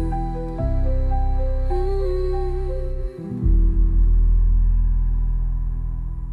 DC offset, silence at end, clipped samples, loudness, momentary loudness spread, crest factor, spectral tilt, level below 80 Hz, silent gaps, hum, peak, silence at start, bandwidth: under 0.1%; 0 s; under 0.1%; -24 LUFS; 9 LU; 10 dB; -10 dB/octave; -20 dBFS; none; none; -8 dBFS; 0 s; 4.3 kHz